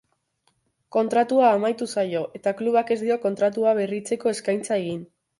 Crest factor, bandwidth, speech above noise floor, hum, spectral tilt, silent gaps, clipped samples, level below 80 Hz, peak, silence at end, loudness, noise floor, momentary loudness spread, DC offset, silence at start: 18 dB; 11.5 kHz; 47 dB; none; -5 dB/octave; none; under 0.1%; -72 dBFS; -6 dBFS; 0.35 s; -23 LUFS; -70 dBFS; 8 LU; under 0.1%; 0.95 s